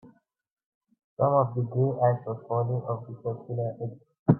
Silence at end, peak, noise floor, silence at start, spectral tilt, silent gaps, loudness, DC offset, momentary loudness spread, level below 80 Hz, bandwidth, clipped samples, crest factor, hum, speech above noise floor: 0 s; -8 dBFS; -58 dBFS; 0.05 s; -14.5 dB/octave; 0.52-0.57 s, 0.66-0.81 s, 1.04-1.17 s, 4.19-4.26 s; -28 LUFS; under 0.1%; 11 LU; -64 dBFS; 2.1 kHz; under 0.1%; 20 dB; none; 31 dB